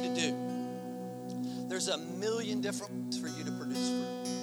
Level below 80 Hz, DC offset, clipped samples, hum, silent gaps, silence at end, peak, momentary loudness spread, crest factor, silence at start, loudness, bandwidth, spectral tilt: -80 dBFS; under 0.1%; under 0.1%; 60 Hz at -65 dBFS; none; 0 s; -18 dBFS; 7 LU; 18 dB; 0 s; -36 LUFS; over 20 kHz; -4 dB/octave